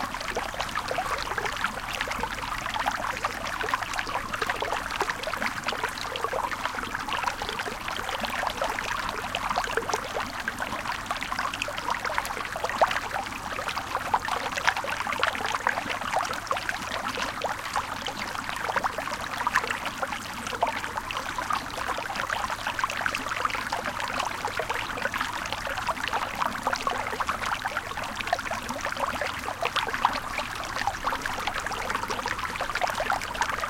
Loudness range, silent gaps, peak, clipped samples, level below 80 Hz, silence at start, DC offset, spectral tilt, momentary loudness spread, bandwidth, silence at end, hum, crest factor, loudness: 2 LU; none; -2 dBFS; under 0.1%; -48 dBFS; 0 s; under 0.1%; -2.5 dB/octave; 5 LU; 17 kHz; 0 s; none; 28 dB; -29 LUFS